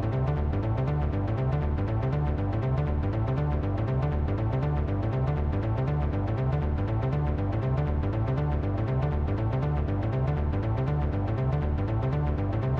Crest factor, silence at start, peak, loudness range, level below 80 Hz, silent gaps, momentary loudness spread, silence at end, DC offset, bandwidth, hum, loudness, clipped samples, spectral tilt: 10 dB; 0 s; -16 dBFS; 0 LU; -32 dBFS; none; 1 LU; 0 s; under 0.1%; 5.4 kHz; none; -28 LUFS; under 0.1%; -10.5 dB/octave